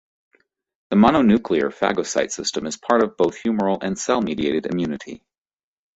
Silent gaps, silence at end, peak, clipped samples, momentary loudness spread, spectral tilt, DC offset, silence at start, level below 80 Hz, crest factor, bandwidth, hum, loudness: none; 0.8 s; -2 dBFS; under 0.1%; 10 LU; -5 dB/octave; under 0.1%; 0.9 s; -52 dBFS; 20 dB; 8.2 kHz; none; -20 LUFS